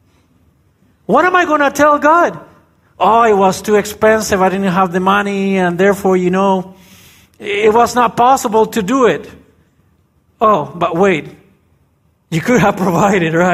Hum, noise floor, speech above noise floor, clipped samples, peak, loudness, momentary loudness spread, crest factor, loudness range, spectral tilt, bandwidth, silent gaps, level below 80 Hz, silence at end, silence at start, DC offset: none; -56 dBFS; 45 dB; under 0.1%; 0 dBFS; -12 LUFS; 7 LU; 14 dB; 4 LU; -5.5 dB/octave; 15.5 kHz; none; -48 dBFS; 0 s; 1.1 s; under 0.1%